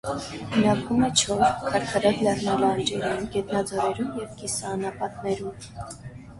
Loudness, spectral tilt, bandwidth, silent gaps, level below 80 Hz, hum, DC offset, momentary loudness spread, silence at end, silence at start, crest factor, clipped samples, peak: -25 LUFS; -4 dB/octave; 11.5 kHz; none; -50 dBFS; none; under 0.1%; 12 LU; 0 s; 0.05 s; 20 dB; under 0.1%; -6 dBFS